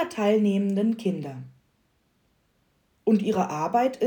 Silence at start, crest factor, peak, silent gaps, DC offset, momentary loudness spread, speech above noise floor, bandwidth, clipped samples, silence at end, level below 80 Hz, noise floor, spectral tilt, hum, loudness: 0 s; 16 dB; -10 dBFS; none; under 0.1%; 11 LU; 45 dB; 19.5 kHz; under 0.1%; 0 s; -72 dBFS; -69 dBFS; -7 dB/octave; none; -25 LUFS